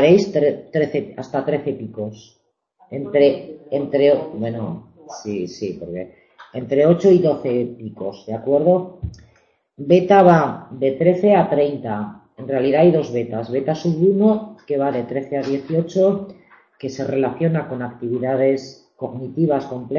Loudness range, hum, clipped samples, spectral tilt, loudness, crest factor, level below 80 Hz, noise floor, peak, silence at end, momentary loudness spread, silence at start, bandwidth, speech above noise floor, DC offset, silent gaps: 6 LU; none; under 0.1%; -8 dB/octave; -19 LUFS; 18 dB; -52 dBFS; -59 dBFS; 0 dBFS; 0 s; 17 LU; 0 s; 7.2 kHz; 40 dB; under 0.1%; none